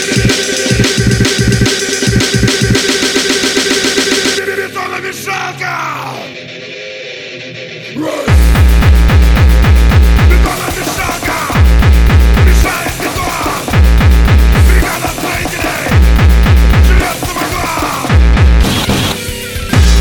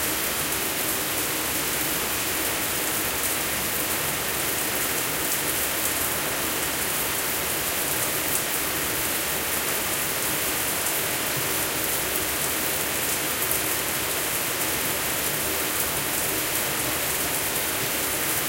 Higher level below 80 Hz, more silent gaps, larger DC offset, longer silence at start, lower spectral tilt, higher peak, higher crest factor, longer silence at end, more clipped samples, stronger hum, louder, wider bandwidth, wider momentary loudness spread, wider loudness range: first, -12 dBFS vs -48 dBFS; neither; neither; about the same, 0 s vs 0 s; first, -4.5 dB/octave vs -1.5 dB/octave; first, 0 dBFS vs -6 dBFS; second, 10 dB vs 20 dB; about the same, 0 s vs 0 s; first, 0.3% vs under 0.1%; neither; first, -10 LUFS vs -23 LUFS; first, 19 kHz vs 17 kHz; first, 11 LU vs 1 LU; first, 6 LU vs 0 LU